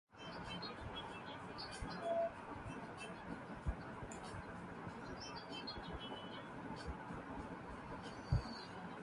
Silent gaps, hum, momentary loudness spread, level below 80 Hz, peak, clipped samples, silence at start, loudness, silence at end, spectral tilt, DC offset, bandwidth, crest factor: none; none; 8 LU; -56 dBFS; -24 dBFS; under 0.1%; 0.1 s; -47 LUFS; 0 s; -5.5 dB/octave; under 0.1%; 11.5 kHz; 22 dB